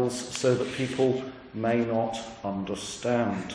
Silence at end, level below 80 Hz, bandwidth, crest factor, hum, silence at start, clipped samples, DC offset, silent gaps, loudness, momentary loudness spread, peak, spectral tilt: 0 s; -60 dBFS; 10.5 kHz; 16 dB; none; 0 s; under 0.1%; under 0.1%; none; -28 LUFS; 8 LU; -12 dBFS; -5 dB/octave